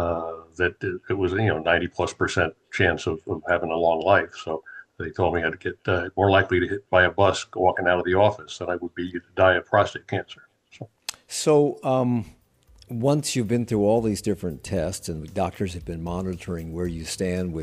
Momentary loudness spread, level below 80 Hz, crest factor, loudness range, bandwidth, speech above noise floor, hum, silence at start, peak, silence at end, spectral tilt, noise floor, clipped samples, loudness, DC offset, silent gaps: 13 LU; -48 dBFS; 20 dB; 4 LU; 15 kHz; 32 dB; none; 0 s; -4 dBFS; 0 s; -5 dB/octave; -55 dBFS; under 0.1%; -24 LUFS; under 0.1%; none